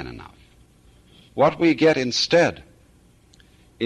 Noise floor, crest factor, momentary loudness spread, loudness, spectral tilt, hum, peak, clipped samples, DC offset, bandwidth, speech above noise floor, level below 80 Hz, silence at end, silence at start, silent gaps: -55 dBFS; 16 dB; 19 LU; -19 LUFS; -4.5 dB/octave; none; -6 dBFS; under 0.1%; under 0.1%; 11 kHz; 36 dB; -54 dBFS; 0 s; 0 s; none